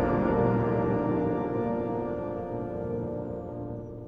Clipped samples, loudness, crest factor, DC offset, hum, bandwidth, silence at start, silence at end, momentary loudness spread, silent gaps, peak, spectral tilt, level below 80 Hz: under 0.1%; -29 LUFS; 16 dB; under 0.1%; none; 5 kHz; 0 s; 0 s; 11 LU; none; -12 dBFS; -10.5 dB/octave; -46 dBFS